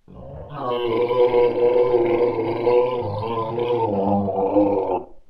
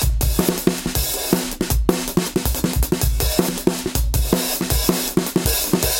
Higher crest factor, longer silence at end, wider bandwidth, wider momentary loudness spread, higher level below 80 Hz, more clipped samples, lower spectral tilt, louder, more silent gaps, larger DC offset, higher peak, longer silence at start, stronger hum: about the same, 16 dB vs 20 dB; about the same, 0.1 s vs 0 s; second, 5.2 kHz vs 17 kHz; first, 8 LU vs 3 LU; second, -48 dBFS vs -24 dBFS; neither; first, -9.5 dB/octave vs -4 dB/octave; about the same, -20 LUFS vs -20 LUFS; neither; neither; second, -6 dBFS vs 0 dBFS; about the same, 0.1 s vs 0 s; neither